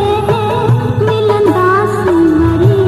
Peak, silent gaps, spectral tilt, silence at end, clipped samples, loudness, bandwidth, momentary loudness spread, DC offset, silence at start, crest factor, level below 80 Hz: 0 dBFS; none; -8 dB/octave; 0 s; under 0.1%; -11 LUFS; 13 kHz; 3 LU; under 0.1%; 0 s; 10 dB; -32 dBFS